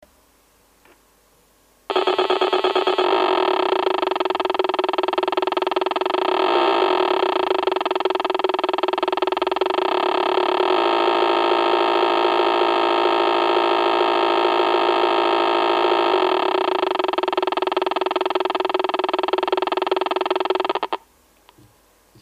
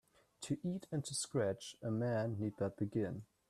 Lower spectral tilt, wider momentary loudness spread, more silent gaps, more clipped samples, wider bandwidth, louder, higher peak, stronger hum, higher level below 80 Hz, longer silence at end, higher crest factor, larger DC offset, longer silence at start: second, -3.5 dB/octave vs -5.5 dB/octave; about the same, 4 LU vs 6 LU; neither; neither; second, 10.5 kHz vs 14 kHz; first, -19 LUFS vs -40 LUFS; first, -6 dBFS vs -24 dBFS; neither; first, -66 dBFS vs -74 dBFS; first, 1.25 s vs 0.25 s; about the same, 14 dB vs 16 dB; neither; first, 1.9 s vs 0.4 s